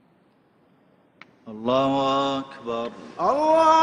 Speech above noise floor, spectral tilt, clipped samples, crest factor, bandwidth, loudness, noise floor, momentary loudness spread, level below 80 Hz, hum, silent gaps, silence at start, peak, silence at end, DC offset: 39 dB; -5 dB/octave; under 0.1%; 18 dB; 10.5 kHz; -23 LUFS; -61 dBFS; 13 LU; -62 dBFS; none; none; 1.45 s; -6 dBFS; 0 s; under 0.1%